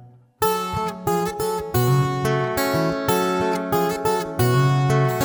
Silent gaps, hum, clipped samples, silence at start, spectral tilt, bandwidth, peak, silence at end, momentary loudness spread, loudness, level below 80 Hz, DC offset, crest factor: none; none; under 0.1%; 0 s; -6 dB/octave; over 20 kHz; -6 dBFS; 0 s; 5 LU; -21 LUFS; -48 dBFS; under 0.1%; 16 dB